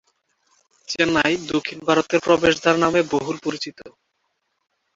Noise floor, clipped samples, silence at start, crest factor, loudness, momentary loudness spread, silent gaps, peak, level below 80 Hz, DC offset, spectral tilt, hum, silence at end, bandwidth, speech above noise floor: -73 dBFS; under 0.1%; 0.9 s; 20 dB; -20 LUFS; 11 LU; none; -2 dBFS; -54 dBFS; under 0.1%; -4.5 dB/octave; none; 1.1 s; 7.8 kHz; 53 dB